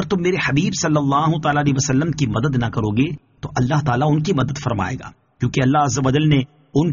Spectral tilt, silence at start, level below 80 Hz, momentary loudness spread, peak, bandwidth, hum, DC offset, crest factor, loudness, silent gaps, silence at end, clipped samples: -6 dB/octave; 0 s; -44 dBFS; 6 LU; -4 dBFS; 7.4 kHz; none; under 0.1%; 14 dB; -19 LUFS; none; 0 s; under 0.1%